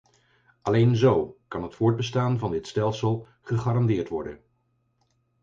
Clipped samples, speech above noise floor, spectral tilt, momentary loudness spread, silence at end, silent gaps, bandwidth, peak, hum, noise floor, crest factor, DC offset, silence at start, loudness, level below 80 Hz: under 0.1%; 47 dB; -7.5 dB/octave; 13 LU; 1.05 s; none; 7.6 kHz; -8 dBFS; none; -71 dBFS; 18 dB; under 0.1%; 0.65 s; -25 LUFS; -54 dBFS